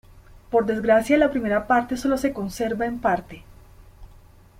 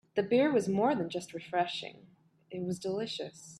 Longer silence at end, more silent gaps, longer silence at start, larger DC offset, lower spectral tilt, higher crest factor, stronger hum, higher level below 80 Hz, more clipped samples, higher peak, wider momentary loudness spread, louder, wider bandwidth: first, 0.55 s vs 0 s; neither; about the same, 0.15 s vs 0.15 s; neither; about the same, -5.5 dB/octave vs -5.5 dB/octave; about the same, 16 dB vs 18 dB; neither; first, -48 dBFS vs -74 dBFS; neither; first, -6 dBFS vs -16 dBFS; second, 8 LU vs 13 LU; first, -22 LUFS vs -32 LUFS; first, 16.5 kHz vs 13 kHz